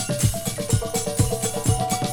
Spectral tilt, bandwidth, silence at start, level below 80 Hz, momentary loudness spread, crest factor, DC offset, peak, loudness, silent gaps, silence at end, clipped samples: -4.5 dB/octave; over 20 kHz; 0 s; -36 dBFS; 2 LU; 16 dB; under 0.1%; -6 dBFS; -23 LUFS; none; 0 s; under 0.1%